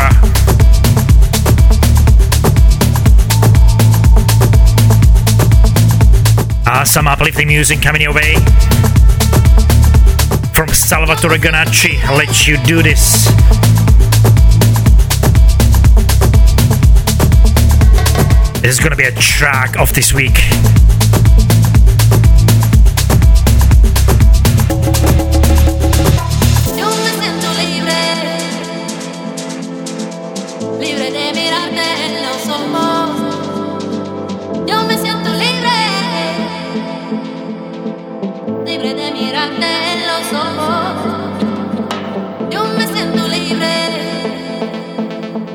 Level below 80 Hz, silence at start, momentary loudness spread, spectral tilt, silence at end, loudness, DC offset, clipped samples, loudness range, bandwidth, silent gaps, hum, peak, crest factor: -12 dBFS; 0 s; 13 LU; -4.5 dB/octave; 0 s; -11 LUFS; under 0.1%; 0.1%; 8 LU; 19.5 kHz; none; none; 0 dBFS; 10 dB